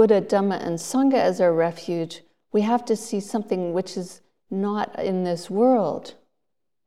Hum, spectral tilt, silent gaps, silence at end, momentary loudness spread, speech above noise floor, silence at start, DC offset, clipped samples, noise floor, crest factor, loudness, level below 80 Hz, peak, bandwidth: none; -6 dB/octave; none; 0.75 s; 13 LU; 61 dB; 0 s; 0.2%; under 0.1%; -83 dBFS; 18 dB; -23 LUFS; -72 dBFS; -6 dBFS; 14.5 kHz